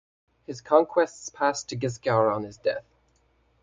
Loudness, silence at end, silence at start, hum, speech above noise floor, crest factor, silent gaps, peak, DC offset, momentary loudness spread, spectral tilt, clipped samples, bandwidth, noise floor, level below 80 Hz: -26 LUFS; 0.85 s; 0.5 s; none; 40 dB; 22 dB; none; -4 dBFS; under 0.1%; 12 LU; -5 dB/octave; under 0.1%; 9.4 kHz; -66 dBFS; -64 dBFS